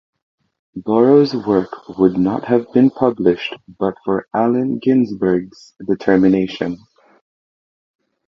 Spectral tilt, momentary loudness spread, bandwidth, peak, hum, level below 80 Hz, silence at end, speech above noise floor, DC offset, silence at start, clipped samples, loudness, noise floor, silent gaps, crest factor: -8.5 dB/octave; 13 LU; 6.4 kHz; 0 dBFS; none; -54 dBFS; 1.5 s; over 74 dB; under 0.1%; 0.75 s; under 0.1%; -16 LUFS; under -90 dBFS; none; 16 dB